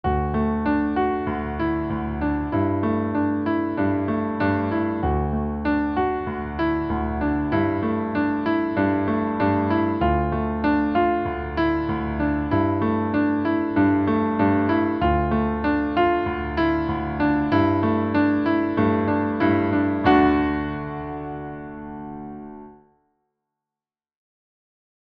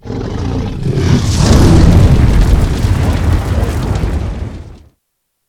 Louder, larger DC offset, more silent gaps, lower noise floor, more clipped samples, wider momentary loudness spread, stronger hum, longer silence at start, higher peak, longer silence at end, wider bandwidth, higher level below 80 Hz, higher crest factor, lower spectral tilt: second, -22 LUFS vs -12 LUFS; neither; neither; first, under -90 dBFS vs -68 dBFS; second, under 0.1% vs 0.7%; second, 7 LU vs 13 LU; neither; about the same, 0.05 s vs 0.05 s; second, -6 dBFS vs 0 dBFS; first, 2.3 s vs 0.7 s; second, 5.4 kHz vs 15 kHz; second, -36 dBFS vs -16 dBFS; first, 16 dB vs 10 dB; first, -10 dB/octave vs -6.5 dB/octave